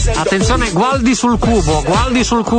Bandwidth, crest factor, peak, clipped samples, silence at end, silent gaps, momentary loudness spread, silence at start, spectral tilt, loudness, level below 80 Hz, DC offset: 9.4 kHz; 12 dB; -2 dBFS; under 0.1%; 0 s; none; 1 LU; 0 s; -5 dB/octave; -13 LUFS; -22 dBFS; under 0.1%